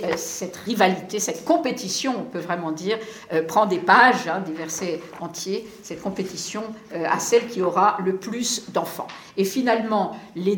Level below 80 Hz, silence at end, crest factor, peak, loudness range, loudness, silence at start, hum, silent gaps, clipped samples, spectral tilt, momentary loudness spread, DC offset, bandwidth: -66 dBFS; 0 s; 22 dB; -2 dBFS; 4 LU; -23 LUFS; 0 s; none; none; under 0.1%; -3.5 dB/octave; 11 LU; under 0.1%; 19 kHz